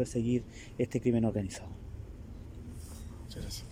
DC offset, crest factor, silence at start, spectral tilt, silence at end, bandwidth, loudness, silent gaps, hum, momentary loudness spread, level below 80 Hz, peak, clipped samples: under 0.1%; 18 dB; 0 s; -6.5 dB/octave; 0 s; 16 kHz; -34 LUFS; none; none; 17 LU; -48 dBFS; -16 dBFS; under 0.1%